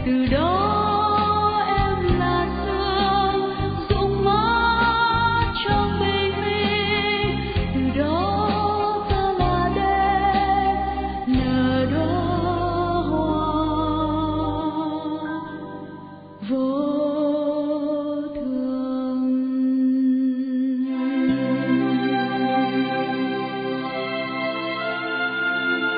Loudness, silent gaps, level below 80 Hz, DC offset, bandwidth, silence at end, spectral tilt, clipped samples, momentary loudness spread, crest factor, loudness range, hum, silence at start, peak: -22 LUFS; none; -36 dBFS; under 0.1%; 5 kHz; 0 s; -11 dB/octave; under 0.1%; 7 LU; 16 dB; 5 LU; none; 0 s; -6 dBFS